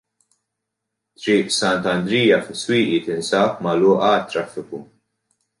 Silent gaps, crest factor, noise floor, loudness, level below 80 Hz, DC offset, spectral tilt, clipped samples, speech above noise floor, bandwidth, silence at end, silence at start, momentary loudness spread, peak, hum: none; 16 dB; -80 dBFS; -19 LUFS; -60 dBFS; under 0.1%; -4.5 dB/octave; under 0.1%; 61 dB; 11.5 kHz; 0.75 s; 1.2 s; 13 LU; -4 dBFS; none